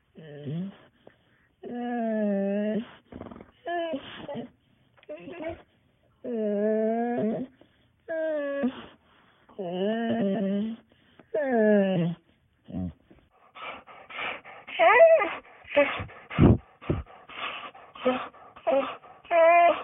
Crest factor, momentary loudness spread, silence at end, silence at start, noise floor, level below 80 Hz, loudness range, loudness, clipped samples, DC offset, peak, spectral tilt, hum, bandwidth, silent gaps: 22 dB; 21 LU; 0 s; 0.15 s; -65 dBFS; -50 dBFS; 10 LU; -26 LUFS; under 0.1%; under 0.1%; -6 dBFS; -10.5 dB/octave; none; 3.8 kHz; none